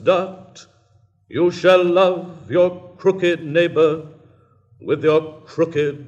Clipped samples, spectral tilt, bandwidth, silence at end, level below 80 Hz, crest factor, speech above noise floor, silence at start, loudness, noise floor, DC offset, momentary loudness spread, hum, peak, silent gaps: under 0.1%; -6.5 dB/octave; 8.2 kHz; 0 s; -68 dBFS; 18 dB; 39 dB; 0 s; -18 LUFS; -57 dBFS; under 0.1%; 14 LU; none; 0 dBFS; none